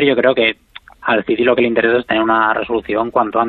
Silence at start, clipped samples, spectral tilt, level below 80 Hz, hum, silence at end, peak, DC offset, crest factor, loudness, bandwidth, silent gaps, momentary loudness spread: 0 s; under 0.1%; -8 dB/octave; -50 dBFS; none; 0 s; -2 dBFS; under 0.1%; 14 dB; -15 LUFS; 4.4 kHz; none; 6 LU